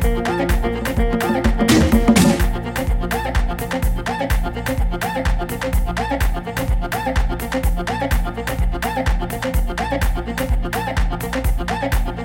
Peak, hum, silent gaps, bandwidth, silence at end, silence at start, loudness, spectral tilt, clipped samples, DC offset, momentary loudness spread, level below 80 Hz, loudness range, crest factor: 0 dBFS; none; none; 17 kHz; 0 s; 0 s; -20 LUFS; -5.5 dB/octave; under 0.1%; under 0.1%; 8 LU; -22 dBFS; 4 LU; 18 dB